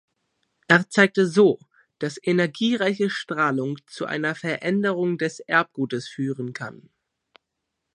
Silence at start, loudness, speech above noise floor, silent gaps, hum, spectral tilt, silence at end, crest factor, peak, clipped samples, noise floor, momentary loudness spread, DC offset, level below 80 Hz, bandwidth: 0.7 s; -23 LUFS; 58 dB; none; none; -5.5 dB/octave; 1.2 s; 24 dB; 0 dBFS; under 0.1%; -80 dBFS; 13 LU; under 0.1%; -74 dBFS; 11 kHz